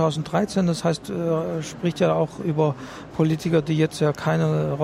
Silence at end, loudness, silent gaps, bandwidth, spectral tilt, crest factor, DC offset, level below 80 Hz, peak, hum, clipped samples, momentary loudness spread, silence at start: 0 s; -23 LUFS; none; 12.5 kHz; -6.5 dB/octave; 16 dB; under 0.1%; -54 dBFS; -8 dBFS; none; under 0.1%; 5 LU; 0 s